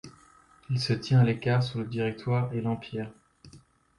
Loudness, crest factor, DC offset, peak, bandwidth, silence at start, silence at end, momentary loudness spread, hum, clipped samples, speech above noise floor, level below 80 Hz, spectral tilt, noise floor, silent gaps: -28 LUFS; 16 dB; under 0.1%; -12 dBFS; 11 kHz; 0.05 s; 0.4 s; 12 LU; none; under 0.1%; 31 dB; -60 dBFS; -7 dB/octave; -58 dBFS; none